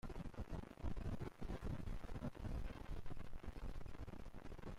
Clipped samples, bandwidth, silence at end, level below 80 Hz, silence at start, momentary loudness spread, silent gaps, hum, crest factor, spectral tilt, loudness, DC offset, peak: under 0.1%; 13 kHz; 0 s; -50 dBFS; 0.05 s; 7 LU; none; none; 10 dB; -7.5 dB/octave; -52 LUFS; under 0.1%; -36 dBFS